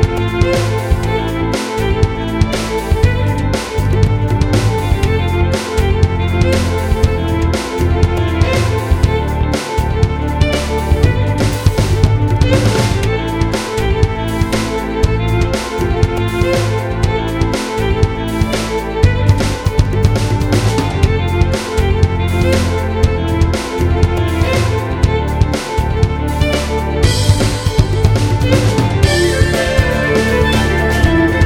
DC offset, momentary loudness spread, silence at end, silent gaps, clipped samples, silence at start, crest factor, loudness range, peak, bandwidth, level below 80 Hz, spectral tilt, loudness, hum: under 0.1%; 4 LU; 0 s; none; under 0.1%; 0 s; 14 dB; 3 LU; 0 dBFS; 16.5 kHz; -20 dBFS; -6 dB/octave; -15 LUFS; none